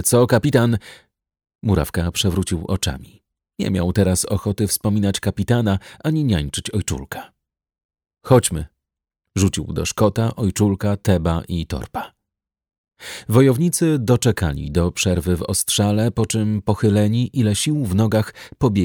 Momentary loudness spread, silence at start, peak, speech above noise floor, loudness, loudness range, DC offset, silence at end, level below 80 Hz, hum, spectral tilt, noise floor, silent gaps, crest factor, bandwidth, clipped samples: 11 LU; 0 s; -2 dBFS; 64 dB; -19 LUFS; 4 LU; under 0.1%; 0 s; -38 dBFS; none; -5.5 dB/octave; -83 dBFS; 1.55-1.59 s, 7.84-7.89 s, 12.78-12.84 s; 18 dB; over 20 kHz; under 0.1%